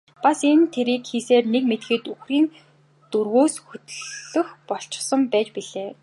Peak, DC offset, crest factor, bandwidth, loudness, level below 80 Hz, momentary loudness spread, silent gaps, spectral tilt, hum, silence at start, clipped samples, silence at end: -4 dBFS; under 0.1%; 18 dB; 11.5 kHz; -22 LUFS; -78 dBFS; 14 LU; none; -3.5 dB/octave; none; 0.2 s; under 0.1%; 0.1 s